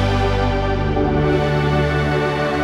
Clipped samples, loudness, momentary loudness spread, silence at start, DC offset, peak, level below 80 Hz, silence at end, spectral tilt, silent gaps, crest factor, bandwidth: under 0.1%; -18 LUFS; 2 LU; 0 s; under 0.1%; -6 dBFS; -26 dBFS; 0 s; -7 dB/octave; none; 12 dB; 10.5 kHz